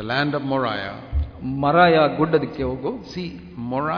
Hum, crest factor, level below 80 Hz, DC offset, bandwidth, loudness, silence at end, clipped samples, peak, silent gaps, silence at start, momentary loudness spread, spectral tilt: none; 18 dB; -36 dBFS; under 0.1%; 5.4 kHz; -21 LUFS; 0 s; under 0.1%; -2 dBFS; none; 0 s; 16 LU; -8 dB/octave